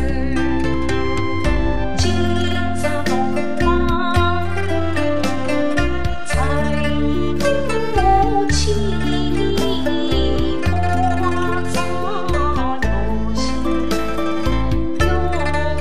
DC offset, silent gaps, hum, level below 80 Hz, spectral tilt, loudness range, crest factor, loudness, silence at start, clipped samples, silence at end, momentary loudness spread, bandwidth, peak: 9%; none; none; -26 dBFS; -5.5 dB/octave; 2 LU; 16 dB; -19 LUFS; 0 s; under 0.1%; 0 s; 4 LU; 14.5 kHz; -4 dBFS